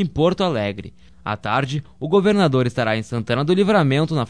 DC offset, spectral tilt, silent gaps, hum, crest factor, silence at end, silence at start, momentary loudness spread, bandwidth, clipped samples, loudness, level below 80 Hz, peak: 0.4%; -7 dB/octave; none; none; 16 dB; 0 s; 0 s; 11 LU; 10.5 kHz; under 0.1%; -19 LUFS; -48 dBFS; -4 dBFS